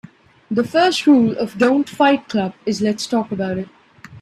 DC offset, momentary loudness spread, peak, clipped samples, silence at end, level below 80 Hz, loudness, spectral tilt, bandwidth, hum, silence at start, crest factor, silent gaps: under 0.1%; 10 LU; -2 dBFS; under 0.1%; 0 s; -58 dBFS; -18 LUFS; -5 dB/octave; 13 kHz; none; 0.5 s; 16 dB; none